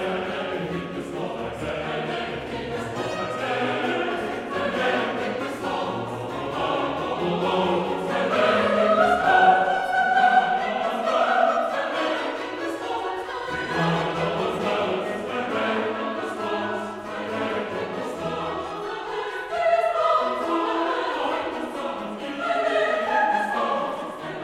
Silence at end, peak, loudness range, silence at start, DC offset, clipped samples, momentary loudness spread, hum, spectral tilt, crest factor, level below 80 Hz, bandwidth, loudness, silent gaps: 0 s; -6 dBFS; 8 LU; 0 s; under 0.1%; under 0.1%; 10 LU; none; -5 dB/octave; 20 dB; -56 dBFS; 14.5 kHz; -24 LUFS; none